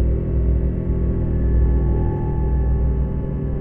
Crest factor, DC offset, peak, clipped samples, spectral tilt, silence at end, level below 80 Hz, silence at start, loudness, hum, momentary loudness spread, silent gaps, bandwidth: 12 dB; under 0.1%; -8 dBFS; under 0.1%; -13 dB/octave; 0 s; -20 dBFS; 0 s; -21 LUFS; none; 4 LU; none; 2.3 kHz